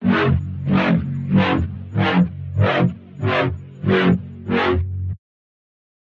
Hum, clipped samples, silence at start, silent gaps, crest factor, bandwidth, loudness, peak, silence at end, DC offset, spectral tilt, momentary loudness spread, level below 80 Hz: none; under 0.1%; 0 s; none; 14 dB; 6.4 kHz; -20 LUFS; -4 dBFS; 0.9 s; under 0.1%; -8.5 dB/octave; 9 LU; -42 dBFS